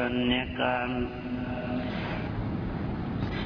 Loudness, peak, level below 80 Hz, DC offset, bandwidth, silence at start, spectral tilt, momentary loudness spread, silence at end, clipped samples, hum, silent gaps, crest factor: -31 LUFS; -12 dBFS; -42 dBFS; under 0.1%; 5.4 kHz; 0 s; -8.5 dB/octave; 6 LU; 0 s; under 0.1%; none; none; 18 dB